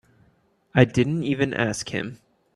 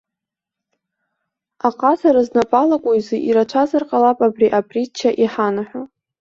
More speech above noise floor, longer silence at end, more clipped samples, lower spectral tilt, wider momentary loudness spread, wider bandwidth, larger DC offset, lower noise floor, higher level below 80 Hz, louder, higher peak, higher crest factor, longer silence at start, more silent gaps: second, 41 dB vs 68 dB; about the same, 0.4 s vs 0.35 s; neither; about the same, -6 dB/octave vs -6 dB/octave; first, 11 LU vs 8 LU; first, 12 kHz vs 7.6 kHz; neither; second, -63 dBFS vs -84 dBFS; first, -54 dBFS vs -60 dBFS; second, -23 LUFS vs -17 LUFS; about the same, -2 dBFS vs -2 dBFS; first, 24 dB vs 16 dB; second, 0.75 s vs 1.65 s; neither